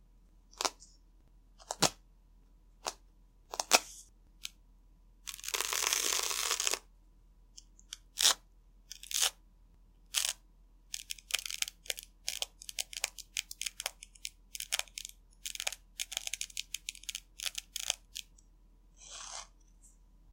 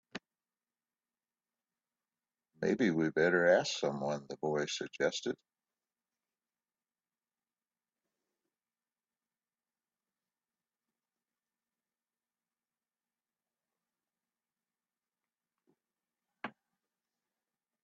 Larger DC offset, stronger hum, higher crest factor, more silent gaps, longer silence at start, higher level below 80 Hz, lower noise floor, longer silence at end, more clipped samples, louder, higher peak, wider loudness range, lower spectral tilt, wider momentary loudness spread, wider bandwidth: neither; neither; first, 34 dB vs 26 dB; neither; first, 0.55 s vs 0.15 s; first, -62 dBFS vs -82 dBFS; second, -62 dBFS vs under -90 dBFS; second, 0 s vs 1.35 s; neither; about the same, -35 LUFS vs -33 LUFS; first, -6 dBFS vs -14 dBFS; second, 7 LU vs 10 LU; second, 0.5 dB/octave vs -3.5 dB/octave; about the same, 18 LU vs 19 LU; first, 17 kHz vs 7.4 kHz